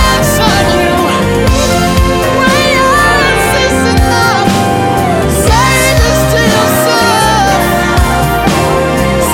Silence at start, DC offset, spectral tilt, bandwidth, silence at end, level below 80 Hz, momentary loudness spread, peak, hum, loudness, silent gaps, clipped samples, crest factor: 0 s; under 0.1%; -4.5 dB/octave; 17.5 kHz; 0 s; -18 dBFS; 3 LU; 0 dBFS; none; -9 LUFS; none; under 0.1%; 8 dB